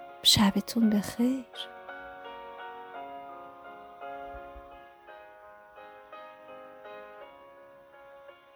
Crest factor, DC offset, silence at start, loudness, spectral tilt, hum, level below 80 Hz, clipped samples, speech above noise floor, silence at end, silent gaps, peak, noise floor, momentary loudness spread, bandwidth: 26 dB; under 0.1%; 0 s; -27 LUFS; -3.5 dB/octave; none; -58 dBFS; under 0.1%; 27 dB; 0.25 s; none; -8 dBFS; -53 dBFS; 25 LU; over 20 kHz